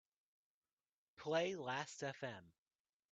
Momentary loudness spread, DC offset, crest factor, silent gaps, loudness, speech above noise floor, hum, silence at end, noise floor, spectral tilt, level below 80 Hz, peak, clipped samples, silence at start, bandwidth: 12 LU; under 0.1%; 22 dB; none; -44 LUFS; over 46 dB; none; 0.6 s; under -90 dBFS; -4 dB/octave; -88 dBFS; -24 dBFS; under 0.1%; 1.2 s; 8.8 kHz